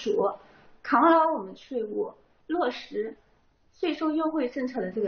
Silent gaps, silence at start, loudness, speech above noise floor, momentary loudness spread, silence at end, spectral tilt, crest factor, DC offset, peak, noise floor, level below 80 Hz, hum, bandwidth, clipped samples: none; 0 s; -27 LUFS; 37 dB; 15 LU; 0 s; -3.5 dB/octave; 20 dB; under 0.1%; -8 dBFS; -64 dBFS; -66 dBFS; none; 6.6 kHz; under 0.1%